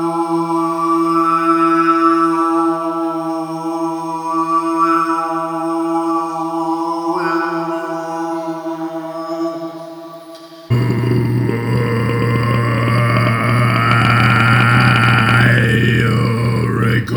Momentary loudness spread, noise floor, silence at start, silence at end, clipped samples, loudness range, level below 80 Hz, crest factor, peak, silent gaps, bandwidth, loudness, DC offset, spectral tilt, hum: 12 LU; -35 dBFS; 0 s; 0 s; under 0.1%; 9 LU; -42 dBFS; 14 dB; 0 dBFS; none; 19.5 kHz; -15 LUFS; under 0.1%; -7 dB/octave; none